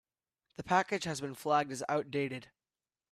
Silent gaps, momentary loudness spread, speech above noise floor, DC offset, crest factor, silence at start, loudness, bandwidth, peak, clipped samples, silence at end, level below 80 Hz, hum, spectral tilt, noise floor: none; 15 LU; over 56 dB; under 0.1%; 22 dB; 0.6 s; -34 LUFS; 14 kHz; -14 dBFS; under 0.1%; 0.7 s; -72 dBFS; none; -4.5 dB/octave; under -90 dBFS